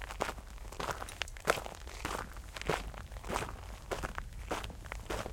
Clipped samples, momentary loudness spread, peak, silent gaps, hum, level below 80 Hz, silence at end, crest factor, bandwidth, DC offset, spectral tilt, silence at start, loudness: under 0.1%; 11 LU; -8 dBFS; none; none; -46 dBFS; 0 s; 32 dB; 17 kHz; under 0.1%; -3.5 dB/octave; 0 s; -40 LUFS